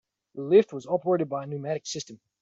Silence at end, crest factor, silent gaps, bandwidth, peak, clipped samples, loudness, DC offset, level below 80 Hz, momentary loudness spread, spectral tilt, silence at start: 0.25 s; 20 dB; none; 7.8 kHz; -8 dBFS; under 0.1%; -26 LUFS; under 0.1%; -72 dBFS; 17 LU; -5.5 dB/octave; 0.35 s